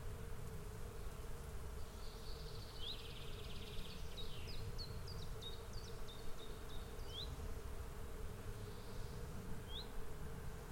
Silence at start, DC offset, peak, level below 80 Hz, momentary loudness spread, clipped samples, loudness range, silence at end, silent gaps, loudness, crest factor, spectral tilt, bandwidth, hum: 0 s; under 0.1%; -34 dBFS; -50 dBFS; 4 LU; under 0.1%; 1 LU; 0 s; none; -51 LUFS; 14 dB; -4.5 dB/octave; 16.5 kHz; none